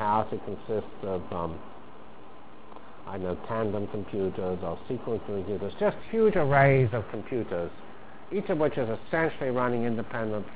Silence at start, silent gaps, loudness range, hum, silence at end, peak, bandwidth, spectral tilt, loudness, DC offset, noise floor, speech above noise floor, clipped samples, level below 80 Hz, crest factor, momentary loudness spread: 0 s; none; 9 LU; none; 0 s; -8 dBFS; 4 kHz; -11 dB/octave; -29 LUFS; 1%; -50 dBFS; 22 dB; under 0.1%; -52 dBFS; 22 dB; 24 LU